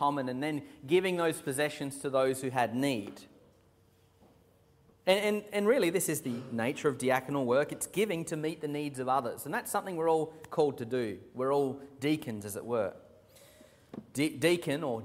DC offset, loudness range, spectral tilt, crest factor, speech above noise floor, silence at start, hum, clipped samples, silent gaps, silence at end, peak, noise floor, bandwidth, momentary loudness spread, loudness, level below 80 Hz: under 0.1%; 4 LU; -4.5 dB/octave; 20 dB; 34 dB; 0 s; none; under 0.1%; none; 0 s; -12 dBFS; -65 dBFS; 16 kHz; 8 LU; -32 LUFS; -72 dBFS